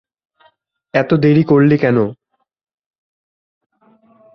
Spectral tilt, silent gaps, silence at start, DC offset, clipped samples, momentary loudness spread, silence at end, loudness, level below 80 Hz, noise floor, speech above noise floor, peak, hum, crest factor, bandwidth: -10 dB/octave; none; 0.95 s; under 0.1%; under 0.1%; 8 LU; 2.2 s; -14 LUFS; -54 dBFS; -57 dBFS; 45 dB; -2 dBFS; none; 16 dB; 6.2 kHz